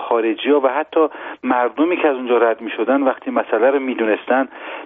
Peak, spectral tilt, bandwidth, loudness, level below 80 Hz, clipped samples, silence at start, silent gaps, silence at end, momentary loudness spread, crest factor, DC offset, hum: -4 dBFS; -1.5 dB/octave; 3.9 kHz; -18 LUFS; -68 dBFS; under 0.1%; 0 s; none; 0 s; 4 LU; 14 dB; under 0.1%; none